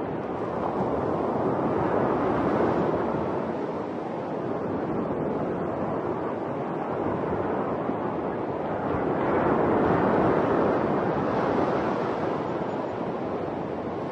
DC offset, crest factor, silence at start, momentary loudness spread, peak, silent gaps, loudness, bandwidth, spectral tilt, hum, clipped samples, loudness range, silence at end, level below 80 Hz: under 0.1%; 16 dB; 0 s; 8 LU; -10 dBFS; none; -27 LUFS; 8.6 kHz; -9 dB/octave; none; under 0.1%; 5 LU; 0 s; -54 dBFS